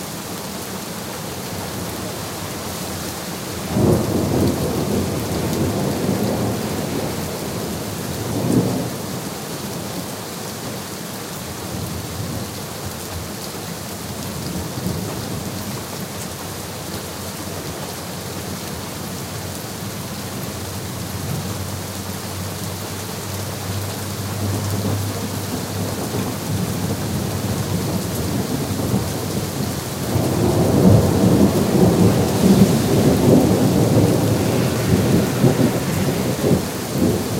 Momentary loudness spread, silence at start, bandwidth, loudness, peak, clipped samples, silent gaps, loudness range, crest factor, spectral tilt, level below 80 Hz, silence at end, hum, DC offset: 12 LU; 0 s; 16 kHz; -21 LUFS; 0 dBFS; under 0.1%; none; 12 LU; 20 dB; -5.5 dB/octave; -40 dBFS; 0 s; none; under 0.1%